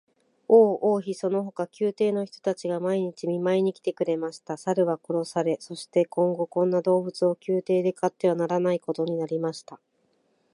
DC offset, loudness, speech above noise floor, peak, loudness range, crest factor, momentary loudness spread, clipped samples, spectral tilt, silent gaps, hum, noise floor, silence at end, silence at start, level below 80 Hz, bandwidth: under 0.1%; -26 LUFS; 44 dB; -6 dBFS; 3 LU; 20 dB; 7 LU; under 0.1%; -7 dB/octave; none; none; -69 dBFS; 0.8 s; 0.5 s; -78 dBFS; 11.5 kHz